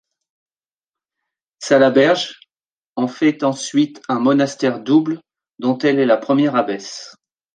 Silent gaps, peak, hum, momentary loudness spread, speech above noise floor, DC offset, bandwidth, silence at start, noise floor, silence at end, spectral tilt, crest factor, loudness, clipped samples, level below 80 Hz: 2.72-2.93 s; 0 dBFS; none; 14 LU; over 74 dB; under 0.1%; 9.4 kHz; 1.6 s; under -90 dBFS; 0.45 s; -5 dB/octave; 18 dB; -17 LUFS; under 0.1%; -66 dBFS